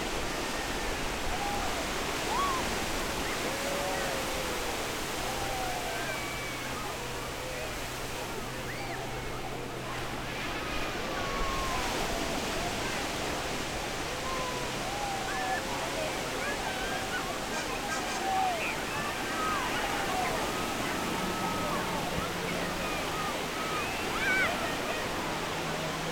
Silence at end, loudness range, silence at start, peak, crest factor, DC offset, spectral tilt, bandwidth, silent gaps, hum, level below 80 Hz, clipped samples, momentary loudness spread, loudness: 0 s; 4 LU; 0 s; -16 dBFS; 16 dB; under 0.1%; -3 dB/octave; over 20 kHz; none; none; -46 dBFS; under 0.1%; 6 LU; -32 LUFS